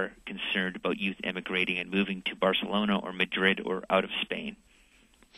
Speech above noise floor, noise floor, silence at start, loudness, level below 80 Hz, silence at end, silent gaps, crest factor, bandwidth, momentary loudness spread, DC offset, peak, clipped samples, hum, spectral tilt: 31 dB; -61 dBFS; 0 s; -29 LUFS; -62 dBFS; 0 s; none; 22 dB; 12 kHz; 8 LU; under 0.1%; -8 dBFS; under 0.1%; none; -6 dB/octave